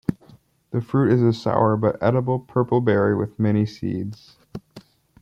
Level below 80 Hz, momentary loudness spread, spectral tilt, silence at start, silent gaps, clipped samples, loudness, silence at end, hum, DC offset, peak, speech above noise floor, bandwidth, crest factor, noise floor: -56 dBFS; 15 LU; -9 dB/octave; 0.1 s; none; under 0.1%; -21 LUFS; 0.4 s; none; under 0.1%; -4 dBFS; 32 dB; 7.4 kHz; 18 dB; -52 dBFS